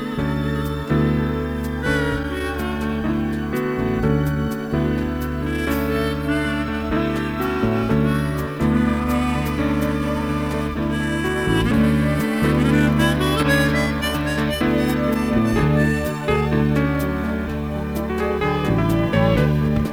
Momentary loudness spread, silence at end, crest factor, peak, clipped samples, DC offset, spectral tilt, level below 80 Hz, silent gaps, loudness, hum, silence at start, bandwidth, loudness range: 6 LU; 0 s; 16 dB; -4 dBFS; under 0.1%; under 0.1%; -6.5 dB/octave; -30 dBFS; none; -20 LUFS; none; 0 s; 19 kHz; 4 LU